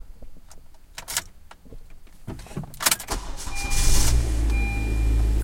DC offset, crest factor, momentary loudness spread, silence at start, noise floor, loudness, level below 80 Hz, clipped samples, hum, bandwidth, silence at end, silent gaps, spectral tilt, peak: under 0.1%; 20 dB; 18 LU; 0 s; -44 dBFS; -25 LUFS; -26 dBFS; under 0.1%; none; 17 kHz; 0 s; none; -3 dB/octave; -4 dBFS